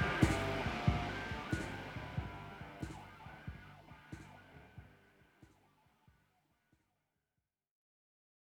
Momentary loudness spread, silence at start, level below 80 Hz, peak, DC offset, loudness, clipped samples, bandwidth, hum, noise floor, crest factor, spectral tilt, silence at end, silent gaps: 23 LU; 0 s; -52 dBFS; -14 dBFS; under 0.1%; -40 LUFS; under 0.1%; 17.5 kHz; none; -90 dBFS; 28 dB; -6 dB/octave; 3.05 s; none